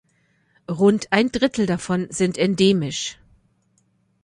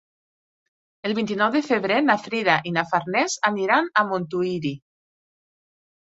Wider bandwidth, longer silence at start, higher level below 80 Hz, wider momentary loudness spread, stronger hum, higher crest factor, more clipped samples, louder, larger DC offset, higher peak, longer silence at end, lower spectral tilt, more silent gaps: first, 11 kHz vs 8.2 kHz; second, 0.7 s vs 1.05 s; first, -54 dBFS vs -68 dBFS; about the same, 9 LU vs 8 LU; neither; about the same, 18 dB vs 22 dB; neither; about the same, -20 LUFS vs -22 LUFS; neither; about the same, -4 dBFS vs -4 dBFS; second, 1.1 s vs 1.35 s; about the same, -5 dB/octave vs -4.5 dB/octave; neither